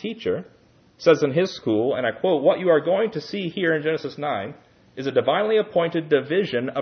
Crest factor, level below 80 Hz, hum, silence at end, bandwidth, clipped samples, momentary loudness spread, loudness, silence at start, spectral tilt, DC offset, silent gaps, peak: 18 dB; -68 dBFS; none; 0 s; 6.6 kHz; under 0.1%; 9 LU; -22 LUFS; 0 s; -6.5 dB/octave; under 0.1%; none; -4 dBFS